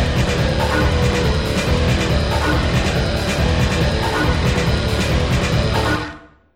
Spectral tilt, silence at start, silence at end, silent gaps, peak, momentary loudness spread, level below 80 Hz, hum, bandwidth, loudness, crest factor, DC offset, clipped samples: -5.5 dB/octave; 0 s; 0.3 s; none; -4 dBFS; 2 LU; -24 dBFS; none; 16 kHz; -18 LUFS; 12 dB; under 0.1%; under 0.1%